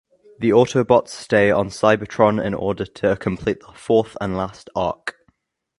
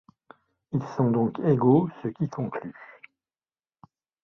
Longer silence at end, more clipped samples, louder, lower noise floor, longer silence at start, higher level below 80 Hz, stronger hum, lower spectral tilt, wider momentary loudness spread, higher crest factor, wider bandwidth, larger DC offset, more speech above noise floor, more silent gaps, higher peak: second, 0.7 s vs 1.4 s; neither; first, -20 LUFS vs -25 LUFS; second, -64 dBFS vs under -90 dBFS; second, 0.4 s vs 0.7 s; first, -48 dBFS vs -66 dBFS; neither; second, -6 dB/octave vs -10 dB/octave; second, 9 LU vs 15 LU; about the same, 20 dB vs 20 dB; first, 11.5 kHz vs 6.4 kHz; neither; second, 45 dB vs over 66 dB; neither; first, 0 dBFS vs -8 dBFS